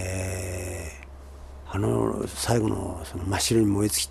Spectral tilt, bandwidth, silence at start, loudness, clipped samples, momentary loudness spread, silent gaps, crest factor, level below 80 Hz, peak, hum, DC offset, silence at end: -4.5 dB/octave; 13 kHz; 0 s; -26 LUFS; under 0.1%; 22 LU; none; 18 dB; -44 dBFS; -8 dBFS; none; under 0.1%; 0 s